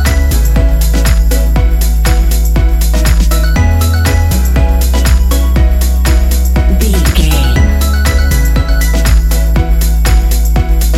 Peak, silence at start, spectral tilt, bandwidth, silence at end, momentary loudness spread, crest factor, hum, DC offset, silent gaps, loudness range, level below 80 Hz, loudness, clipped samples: 0 dBFS; 0 s; -5 dB/octave; 16 kHz; 0 s; 2 LU; 8 dB; none; under 0.1%; none; 1 LU; -8 dBFS; -11 LUFS; under 0.1%